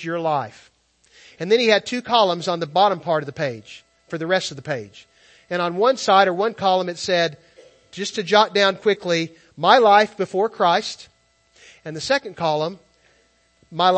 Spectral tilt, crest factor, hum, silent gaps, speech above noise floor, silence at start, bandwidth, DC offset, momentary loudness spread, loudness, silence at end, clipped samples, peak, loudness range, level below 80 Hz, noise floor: -4 dB/octave; 20 dB; none; none; 41 dB; 0 s; 8.8 kHz; under 0.1%; 15 LU; -20 LUFS; 0 s; under 0.1%; 0 dBFS; 6 LU; -66 dBFS; -60 dBFS